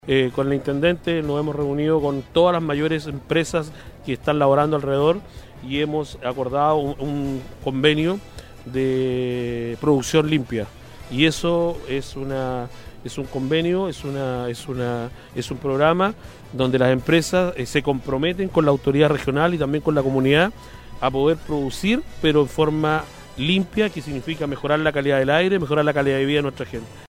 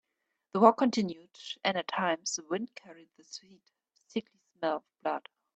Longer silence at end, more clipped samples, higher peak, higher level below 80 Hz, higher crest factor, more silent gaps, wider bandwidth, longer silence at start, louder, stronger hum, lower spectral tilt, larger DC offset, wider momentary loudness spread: second, 0 s vs 0.35 s; neither; first, -2 dBFS vs -6 dBFS; first, -44 dBFS vs -78 dBFS; second, 18 dB vs 26 dB; neither; first, 16 kHz vs 8.8 kHz; second, 0.05 s vs 0.55 s; first, -21 LUFS vs -31 LUFS; neither; first, -6 dB/octave vs -4 dB/octave; neither; second, 11 LU vs 22 LU